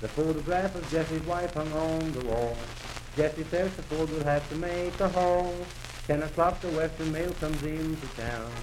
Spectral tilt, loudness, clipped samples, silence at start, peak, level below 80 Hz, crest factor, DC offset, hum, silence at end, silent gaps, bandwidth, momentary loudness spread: -6 dB/octave; -30 LUFS; under 0.1%; 0 s; -12 dBFS; -42 dBFS; 18 dB; under 0.1%; none; 0 s; none; 16.5 kHz; 8 LU